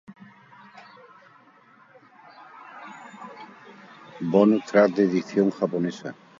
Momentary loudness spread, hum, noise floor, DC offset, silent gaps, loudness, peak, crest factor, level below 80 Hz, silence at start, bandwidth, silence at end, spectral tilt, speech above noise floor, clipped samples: 26 LU; none; -55 dBFS; under 0.1%; none; -22 LUFS; -4 dBFS; 22 dB; -76 dBFS; 0.1 s; 7.6 kHz; 0.3 s; -7.5 dB/octave; 34 dB; under 0.1%